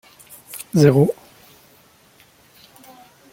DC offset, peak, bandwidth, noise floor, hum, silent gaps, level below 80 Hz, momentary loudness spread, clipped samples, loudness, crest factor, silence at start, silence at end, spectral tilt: under 0.1%; -2 dBFS; 17 kHz; -53 dBFS; none; none; -58 dBFS; 22 LU; under 0.1%; -16 LUFS; 20 dB; 0.55 s; 2.2 s; -7 dB/octave